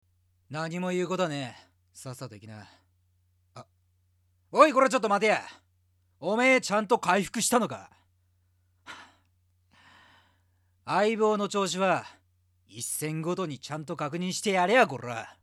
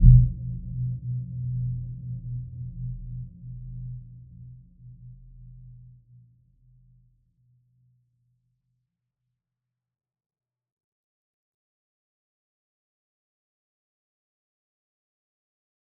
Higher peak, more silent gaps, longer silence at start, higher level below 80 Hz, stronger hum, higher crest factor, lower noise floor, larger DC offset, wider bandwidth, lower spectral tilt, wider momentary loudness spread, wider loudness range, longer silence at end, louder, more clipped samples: second, -6 dBFS vs -2 dBFS; neither; first, 0.5 s vs 0 s; second, -74 dBFS vs -34 dBFS; neither; about the same, 24 dB vs 28 dB; second, -69 dBFS vs -87 dBFS; neither; first, 14.5 kHz vs 0.6 kHz; second, -4 dB/octave vs -23 dB/octave; about the same, 21 LU vs 19 LU; second, 10 LU vs 20 LU; second, 0.15 s vs 10.2 s; first, -26 LUFS vs -29 LUFS; neither